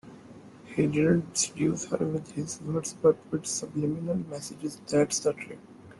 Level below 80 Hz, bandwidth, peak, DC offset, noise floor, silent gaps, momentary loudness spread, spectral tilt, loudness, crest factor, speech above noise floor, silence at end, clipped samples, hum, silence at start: -62 dBFS; 12.5 kHz; -10 dBFS; under 0.1%; -49 dBFS; none; 13 LU; -5 dB/octave; -29 LUFS; 18 dB; 21 dB; 0.05 s; under 0.1%; none; 0.05 s